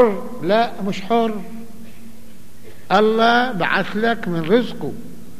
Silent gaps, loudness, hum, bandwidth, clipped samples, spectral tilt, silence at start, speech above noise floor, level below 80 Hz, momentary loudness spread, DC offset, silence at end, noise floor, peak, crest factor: none; -19 LUFS; none; 15 kHz; under 0.1%; -6 dB/octave; 0 s; 26 dB; -54 dBFS; 16 LU; 4%; 0.05 s; -44 dBFS; -2 dBFS; 18 dB